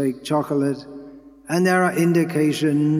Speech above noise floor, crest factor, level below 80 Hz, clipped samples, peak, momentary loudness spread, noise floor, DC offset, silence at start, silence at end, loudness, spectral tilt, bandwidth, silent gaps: 23 dB; 16 dB; -64 dBFS; under 0.1%; -4 dBFS; 12 LU; -42 dBFS; under 0.1%; 0 s; 0 s; -20 LUFS; -6.5 dB/octave; 15.5 kHz; none